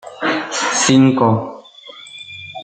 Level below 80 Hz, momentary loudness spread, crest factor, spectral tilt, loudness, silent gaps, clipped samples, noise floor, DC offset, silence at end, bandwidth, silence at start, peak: -56 dBFS; 22 LU; 16 dB; -4 dB/octave; -15 LUFS; none; under 0.1%; -39 dBFS; under 0.1%; 0 s; 9.2 kHz; 0.05 s; -2 dBFS